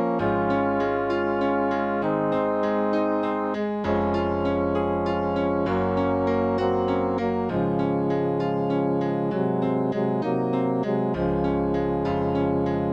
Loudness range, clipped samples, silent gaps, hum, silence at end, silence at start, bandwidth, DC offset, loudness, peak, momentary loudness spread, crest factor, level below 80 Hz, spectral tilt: 1 LU; under 0.1%; none; none; 0 s; 0 s; 7 kHz; under 0.1%; -24 LUFS; -10 dBFS; 2 LU; 12 dB; -48 dBFS; -9 dB/octave